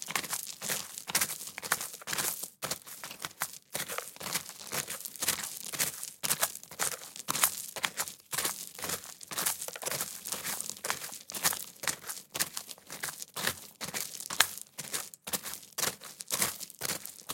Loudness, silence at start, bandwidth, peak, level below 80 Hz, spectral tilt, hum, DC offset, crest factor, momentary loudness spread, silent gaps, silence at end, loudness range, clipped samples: -34 LUFS; 0 s; 17 kHz; 0 dBFS; -74 dBFS; 0 dB/octave; none; under 0.1%; 36 dB; 9 LU; none; 0 s; 3 LU; under 0.1%